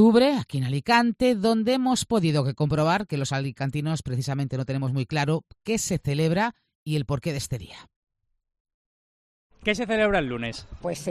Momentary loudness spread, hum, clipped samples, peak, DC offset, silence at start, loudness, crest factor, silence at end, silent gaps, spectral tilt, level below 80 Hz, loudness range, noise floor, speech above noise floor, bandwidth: 10 LU; none; under 0.1%; -6 dBFS; under 0.1%; 0 s; -25 LUFS; 20 dB; 0 s; 6.75-6.86 s, 7.96-8.02 s, 8.60-8.65 s, 8.74-9.50 s; -5.5 dB/octave; -50 dBFS; 7 LU; under -90 dBFS; over 66 dB; 14.5 kHz